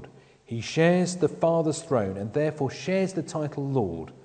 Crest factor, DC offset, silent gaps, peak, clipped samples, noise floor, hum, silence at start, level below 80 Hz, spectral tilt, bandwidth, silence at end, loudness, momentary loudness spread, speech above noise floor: 18 dB; under 0.1%; none; -8 dBFS; under 0.1%; -50 dBFS; none; 0 s; -62 dBFS; -6 dB/octave; 9.4 kHz; 0.1 s; -26 LUFS; 9 LU; 24 dB